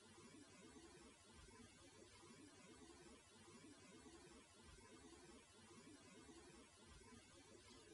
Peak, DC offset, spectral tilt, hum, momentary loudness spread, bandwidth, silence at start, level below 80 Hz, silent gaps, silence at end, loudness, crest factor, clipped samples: -52 dBFS; under 0.1%; -3.5 dB/octave; none; 2 LU; 11.5 kHz; 0 s; -78 dBFS; none; 0 s; -65 LUFS; 14 dB; under 0.1%